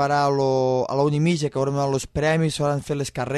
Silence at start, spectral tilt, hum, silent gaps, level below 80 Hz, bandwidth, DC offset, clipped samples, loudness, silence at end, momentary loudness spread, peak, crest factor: 0 s; -6 dB/octave; none; none; -48 dBFS; 13 kHz; under 0.1%; under 0.1%; -22 LUFS; 0 s; 4 LU; -8 dBFS; 14 dB